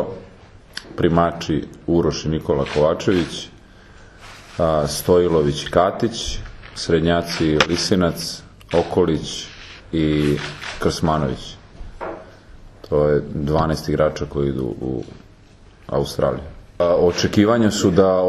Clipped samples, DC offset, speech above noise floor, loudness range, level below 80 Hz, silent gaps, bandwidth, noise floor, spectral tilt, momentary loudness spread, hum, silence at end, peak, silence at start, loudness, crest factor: under 0.1%; under 0.1%; 28 dB; 4 LU; -38 dBFS; none; 13 kHz; -46 dBFS; -5.5 dB/octave; 17 LU; none; 0 s; 0 dBFS; 0 s; -20 LUFS; 20 dB